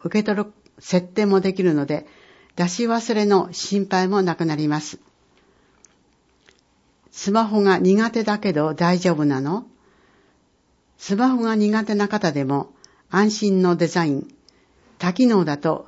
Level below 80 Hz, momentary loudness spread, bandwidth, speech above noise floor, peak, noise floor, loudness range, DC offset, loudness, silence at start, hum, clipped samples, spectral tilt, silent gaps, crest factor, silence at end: -64 dBFS; 9 LU; 8 kHz; 43 dB; -6 dBFS; -62 dBFS; 5 LU; under 0.1%; -20 LUFS; 0.05 s; none; under 0.1%; -6 dB/octave; none; 16 dB; 0.05 s